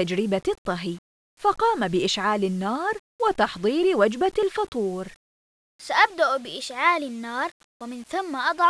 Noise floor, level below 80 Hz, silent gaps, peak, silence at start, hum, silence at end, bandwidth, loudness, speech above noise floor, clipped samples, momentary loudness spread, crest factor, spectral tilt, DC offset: under -90 dBFS; -58 dBFS; 0.58-0.65 s, 0.98-1.37 s, 2.99-3.19 s, 4.68-4.72 s, 5.16-5.79 s, 7.51-7.80 s; -4 dBFS; 0 s; none; 0 s; 11 kHz; -24 LUFS; over 66 dB; under 0.1%; 12 LU; 20 dB; -4.5 dB/octave; under 0.1%